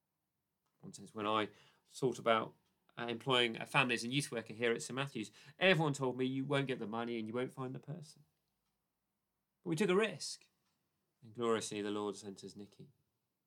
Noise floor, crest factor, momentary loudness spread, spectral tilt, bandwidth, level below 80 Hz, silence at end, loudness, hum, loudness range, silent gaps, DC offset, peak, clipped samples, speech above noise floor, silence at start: -88 dBFS; 26 dB; 18 LU; -4.5 dB/octave; 17 kHz; -90 dBFS; 0.6 s; -37 LUFS; none; 7 LU; none; under 0.1%; -14 dBFS; under 0.1%; 50 dB; 0.85 s